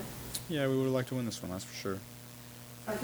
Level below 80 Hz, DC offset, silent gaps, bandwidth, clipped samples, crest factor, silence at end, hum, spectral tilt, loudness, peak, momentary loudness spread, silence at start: -62 dBFS; under 0.1%; none; over 20 kHz; under 0.1%; 24 dB; 0 s; none; -5 dB/octave; -35 LUFS; -12 dBFS; 17 LU; 0 s